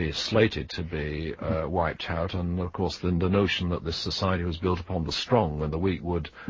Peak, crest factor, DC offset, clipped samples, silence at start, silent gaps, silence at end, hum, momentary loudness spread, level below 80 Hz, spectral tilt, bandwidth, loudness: -8 dBFS; 20 dB; under 0.1%; under 0.1%; 0 s; none; 0 s; none; 8 LU; -38 dBFS; -6 dB/octave; 7.6 kHz; -28 LUFS